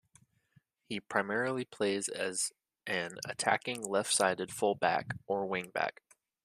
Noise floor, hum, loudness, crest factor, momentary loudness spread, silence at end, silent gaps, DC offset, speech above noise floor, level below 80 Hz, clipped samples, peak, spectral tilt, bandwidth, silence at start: -70 dBFS; none; -33 LUFS; 24 dB; 7 LU; 0.55 s; none; under 0.1%; 37 dB; -76 dBFS; under 0.1%; -10 dBFS; -2.5 dB/octave; 14.5 kHz; 0.9 s